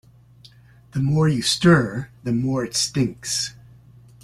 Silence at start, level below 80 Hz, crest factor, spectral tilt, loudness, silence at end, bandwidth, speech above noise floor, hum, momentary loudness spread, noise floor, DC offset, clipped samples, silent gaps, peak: 0.95 s; -52 dBFS; 18 dB; -4.5 dB/octave; -21 LUFS; 0.7 s; 14.5 kHz; 29 dB; none; 12 LU; -50 dBFS; under 0.1%; under 0.1%; none; -4 dBFS